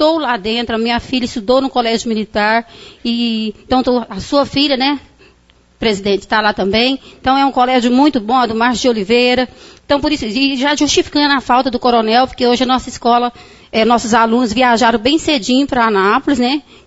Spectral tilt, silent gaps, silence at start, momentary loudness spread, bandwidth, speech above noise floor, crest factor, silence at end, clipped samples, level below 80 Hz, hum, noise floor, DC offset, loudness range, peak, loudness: -3.5 dB/octave; none; 0 s; 6 LU; 8 kHz; 37 dB; 14 dB; 0.25 s; under 0.1%; -42 dBFS; none; -50 dBFS; under 0.1%; 3 LU; 0 dBFS; -14 LUFS